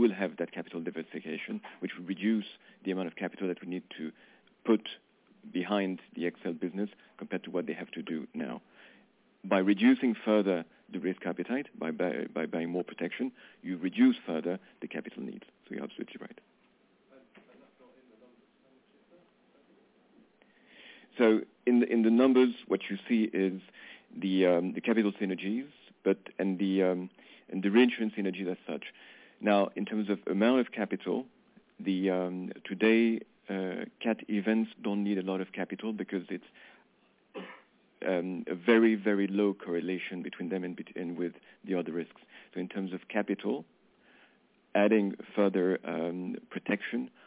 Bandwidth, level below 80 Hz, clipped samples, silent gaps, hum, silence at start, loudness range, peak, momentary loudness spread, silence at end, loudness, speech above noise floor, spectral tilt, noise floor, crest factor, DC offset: 4 kHz; -82 dBFS; under 0.1%; none; none; 0 s; 9 LU; -10 dBFS; 16 LU; 0.2 s; -31 LUFS; 37 dB; -5 dB/octave; -68 dBFS; 22 dB; under 0.1%